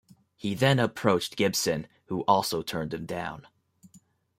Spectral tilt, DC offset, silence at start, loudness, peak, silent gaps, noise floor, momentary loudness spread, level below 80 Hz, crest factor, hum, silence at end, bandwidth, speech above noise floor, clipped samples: -4.5 dB/octave; under 0.1%; 0.45 s; -27 LUFS; -6 dBFS; none; -60 dBFS; 11 LU; -62 dBFS; 24 dB; none; 0.4 s; 16 kHz; 33 dB; under 0.1%